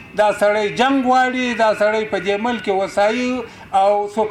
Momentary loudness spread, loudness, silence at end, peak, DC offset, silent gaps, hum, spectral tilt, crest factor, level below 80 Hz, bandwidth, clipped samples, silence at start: 5 LU; -17 LUFS; 0 s; -6 dBFS; under 0.1%; none; none; -4.5 dB/octave; 12 dB; -54 dBFS; 12.5 kHz; under 0.1%; 0 s